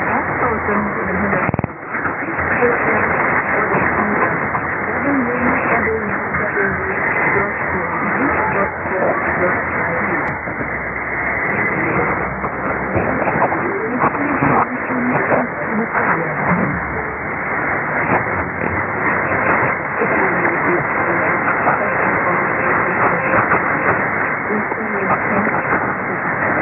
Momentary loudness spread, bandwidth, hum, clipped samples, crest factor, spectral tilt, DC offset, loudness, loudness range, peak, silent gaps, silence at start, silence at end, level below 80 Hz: 5 LU; 3 kHz; none; under 0.1%; 16 dB; -12.5 dB/octave; under 0.1%; -17 LUFS; 3 LU; -2 dBFS; none; 0 s; 0 s; -42 dBFS